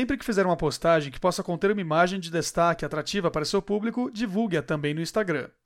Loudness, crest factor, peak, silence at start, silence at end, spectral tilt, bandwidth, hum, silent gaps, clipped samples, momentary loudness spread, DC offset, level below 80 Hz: -26 LUFS; 16 dB; -8 dBFS; 0 s; 0.2 s; -5 dB/octave; 16.5 kHz; none; none; under 0.1%; 5 LU; under 0.1%; -50 dBFS